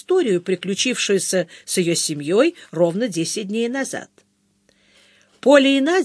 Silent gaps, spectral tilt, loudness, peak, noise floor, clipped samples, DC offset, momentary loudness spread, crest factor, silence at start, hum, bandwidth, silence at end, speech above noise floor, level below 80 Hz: none; -3.5 dB/octave; -19 LUFS; 0 dBFS; -63 dBFS; under 0.1%; under 0.1%; 9 LU; 20 dB; 0.1 s; none; 11 kHz; 0 s; 44 dB; -74 dBFS